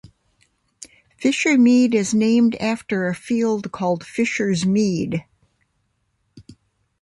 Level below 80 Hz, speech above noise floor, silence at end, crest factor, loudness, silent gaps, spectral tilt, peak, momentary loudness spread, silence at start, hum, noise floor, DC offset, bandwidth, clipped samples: -58 dBFS; 51 dB; 0.5 s; 14 dB; -19 LUFS; none; -5.5 dB/octave; -6 dBFS; 9 LU; 0.8 s; none; -69 dBFS; under 0.1%; 11.5 kHz; under 0.1%